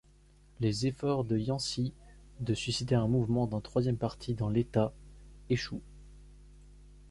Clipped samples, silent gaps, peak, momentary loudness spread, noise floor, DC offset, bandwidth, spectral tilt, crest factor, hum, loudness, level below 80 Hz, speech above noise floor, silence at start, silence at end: under 0.1%; none; -14 dBFS; 6 LU; -60 dBFS; under 0.1%; 11.5 kHz; -6.5 dB/octave; 20 dB; 50 Hz at -50 dBFS; -32 LUFS; -52 dBFS; 29 dB; 0.6 s; 0 s